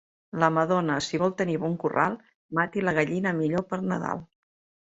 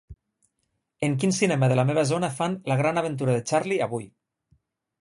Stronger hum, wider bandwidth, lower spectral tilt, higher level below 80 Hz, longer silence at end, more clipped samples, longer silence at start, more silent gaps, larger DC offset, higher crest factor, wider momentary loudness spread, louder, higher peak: neither; second, 8 kHz vs 11.5 kHz; about the same, -6 dB/octave vs -6 dB/octave; about the same, -62 dBFS vs -60 dBFS; second, 0.6 s vs 0.95 s; neither; first, 0.35 s vs 0.1 s; first, 2.34-2.49 s vs none; neither; about the same, 20 dB vs 18 dB; about the same, 7 LU vs 7 LU; about the same, -26 LUFS vs -24 LUFS; about the same, -8 dBFS vs -8 dBFS